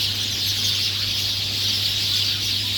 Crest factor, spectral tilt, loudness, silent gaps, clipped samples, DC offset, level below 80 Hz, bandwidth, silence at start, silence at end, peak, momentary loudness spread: 14 dB; -1 dB/octave; -20 LUFS; none; under 0.1%; under 0.1%; -48 dBFS; over 20 kHz; 0 s; 0 s; -8 dBFS; 2 LU